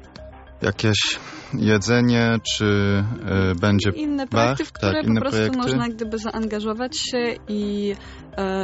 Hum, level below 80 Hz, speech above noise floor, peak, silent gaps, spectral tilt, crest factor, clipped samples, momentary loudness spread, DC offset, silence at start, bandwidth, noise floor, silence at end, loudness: none; -46 dBFS; 20 dB; -4 dBFS; none; -4.5 dB/octave; 18 dB; under 0.1%; 9 LU; under 0.1%; 0 s; 8 kHz; -41 dBFS; 0 s; -22 LUFS